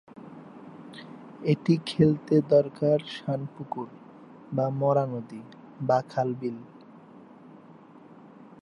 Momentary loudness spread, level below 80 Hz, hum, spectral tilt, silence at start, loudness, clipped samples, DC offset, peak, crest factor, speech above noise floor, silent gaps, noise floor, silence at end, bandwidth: 23 LU; -66 dBFS; none; -8.5 dB/octave; 0.15 s; -27 LUFS; under 0.1%; under 0.1%; -8 dBFS; 20 dB; 25 dB; none; -50 dBFS; 0.2 s; 11 kHz